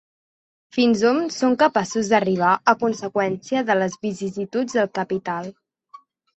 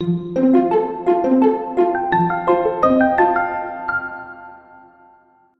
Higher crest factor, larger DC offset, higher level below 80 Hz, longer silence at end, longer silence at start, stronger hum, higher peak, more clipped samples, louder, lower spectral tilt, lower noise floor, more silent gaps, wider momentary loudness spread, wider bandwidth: about the same, 20 dB vs 16 dB; neither; second, -64 dBFS vs -52 dBFS; second, 0.45 s vs 1 s; first, 0.75 s vs 0 s; neither; about the same, -2 dBFS vs -2 dBFS; neither; second, -21 LUFS vs -17 LUFS; second, -5 dB/octave vs -9 dB/octave; second, -49 dBFS vs -53 dBFS; neither; about the same, 10 LU vs 10 LU; first, 8.2 kHz vs 6 kHz